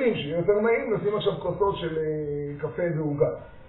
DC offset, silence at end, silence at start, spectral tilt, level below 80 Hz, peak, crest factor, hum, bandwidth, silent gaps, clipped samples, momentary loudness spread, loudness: under 0.1%; 0 s; 0 s; -5.5 dB/octave; -52 dBFS; -10 dBFS; 16 dB; none; 4.1 kHz; none; under 0.1%; 7 LU; -26 LUFS